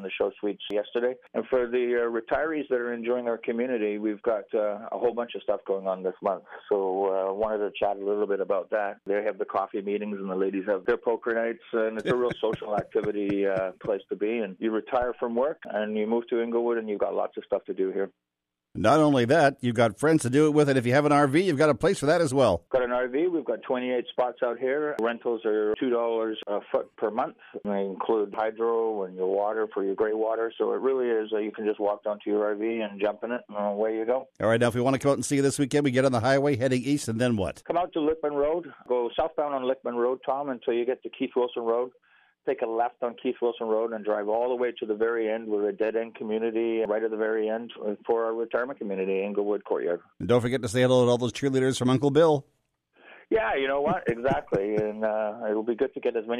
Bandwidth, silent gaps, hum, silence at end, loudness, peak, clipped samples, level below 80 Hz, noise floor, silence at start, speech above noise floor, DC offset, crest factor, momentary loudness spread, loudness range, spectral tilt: 13.5 kHz; none; none; 0 s; -27 LUFS; -8 dBFS; under 0.1%; -60 dBFS; -63 dBFS; 0 s; 37 dB; under 0.1%; 18 dB; 8 LU; 5 LU; -6 dB/octave